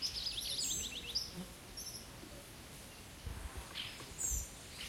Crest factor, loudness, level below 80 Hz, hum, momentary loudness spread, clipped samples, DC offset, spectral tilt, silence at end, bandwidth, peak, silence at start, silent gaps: 18 dB; -41 LUFS; -54 dBFS; none; 14 LU; under 0.1%; under 0.1%; -1 dB/octave; 0 s; 16.5 kHz; -26 dBFS; 0 s; none